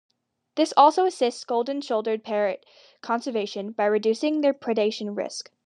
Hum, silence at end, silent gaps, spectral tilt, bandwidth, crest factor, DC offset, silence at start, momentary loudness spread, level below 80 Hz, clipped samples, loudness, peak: none; 0.25 s; none; -4 dB/octave; 10.5 kHz; 20 dB; under 0.1%; 0.55 s; 13 LU; -90 dBFS; under 0.1%; -24 LUFS; -4 dBFS